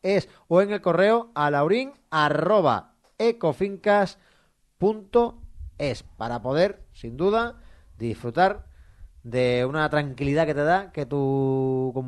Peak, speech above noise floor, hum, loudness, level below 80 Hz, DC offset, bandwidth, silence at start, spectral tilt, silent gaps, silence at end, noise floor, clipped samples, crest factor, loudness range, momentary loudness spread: -6 dBFS; 40 dB; none; -24 LUFS; -50 dBFS; under 0.1%; 11.5 kHz; 0.05 s; -7 dB/octave; none; 0 s; -63 dBFS; under 0.1%; 18 dB; 4 LU; 10 LU